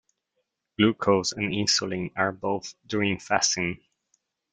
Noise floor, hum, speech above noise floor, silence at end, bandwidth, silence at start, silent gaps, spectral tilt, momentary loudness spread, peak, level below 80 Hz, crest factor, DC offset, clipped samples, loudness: -78 dBFS; none; 53 dB; 0.75 s; 10 kHz; 0.8 s; none; -3.5 dB/octave; 9 LU; -6 dBFS; -62 dBFS; 20 dB; under 0.1%; under 0.1%; -25 LUFS